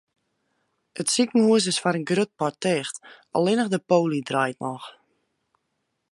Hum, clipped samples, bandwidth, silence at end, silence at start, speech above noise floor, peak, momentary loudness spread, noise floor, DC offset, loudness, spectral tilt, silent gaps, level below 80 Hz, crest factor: none; under 0.1%; 11.5 kHz; 1.2 s; 0.95 s; 54 dB; -6 dBFS; 15 LU; -77 dBFS; under 0.1%; -23 LUFS; -4.5 dB/octave; none; -74 dBFS; 20 dB